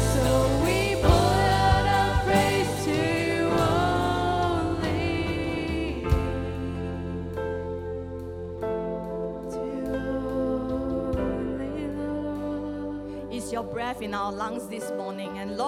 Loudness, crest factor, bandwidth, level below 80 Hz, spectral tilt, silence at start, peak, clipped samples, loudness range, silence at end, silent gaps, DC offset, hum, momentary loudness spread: -27 LUFS; 20 dB; 16.5 kHz; -36 dBFS; -5.5 dB/octave; 0 s; -6 dBFS; under 0.1%; 9 LU; 0 s; none; under 0.1%; none; 11 LU